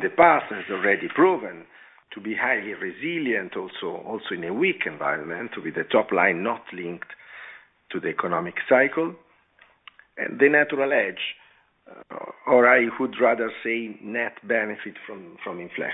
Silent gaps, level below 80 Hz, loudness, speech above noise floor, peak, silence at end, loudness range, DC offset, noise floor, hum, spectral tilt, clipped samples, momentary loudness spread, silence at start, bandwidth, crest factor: none; -70 dBFS; -23 LUFS; 35 dB; -2 dBFS; 0 s; 5 LU; under 0.1%; -59 dBFS; none; -8 dB/octave; under 0.1%; 20 LU; 0 s; 4 kHz; 22 dB